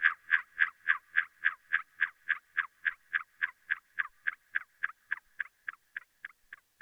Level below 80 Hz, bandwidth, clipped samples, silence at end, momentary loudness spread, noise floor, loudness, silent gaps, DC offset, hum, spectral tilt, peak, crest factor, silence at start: -82 dBFS; over 20 kHz; under 0.1%; 0.25 s; 15 LU; -57 dBFS; -33 LUFS; none; under 0.1%; none; 0.5 dB/octave; -12 dBFS; 24 dB; 0 s